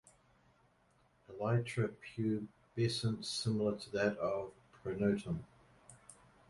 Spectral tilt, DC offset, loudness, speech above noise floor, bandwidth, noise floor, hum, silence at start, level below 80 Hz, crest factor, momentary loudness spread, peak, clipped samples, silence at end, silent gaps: -6 dB/octave; under 0.1%; -38 LUFS; 35 dB; 11.5 kHz; -72 dBFS; none; 1.3 s; -66 dBFS; 18 dB; 14 LU; -20 dBFS; under 0.1%; 0.35 s; none